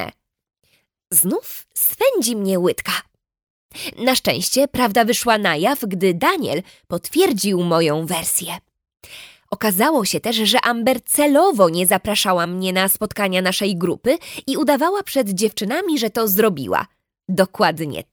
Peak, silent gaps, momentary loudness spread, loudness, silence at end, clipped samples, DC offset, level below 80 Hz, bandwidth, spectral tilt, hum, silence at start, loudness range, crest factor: -2 dBFS; 3.43-3.69 s; 9 LU; -18 LUFS; 0.1 s; under 0.1%; under 0.1%; -56 dBFS; over 20 kHz; -3.5 dB/octave; none; 0 s; 3 LU; 18 dB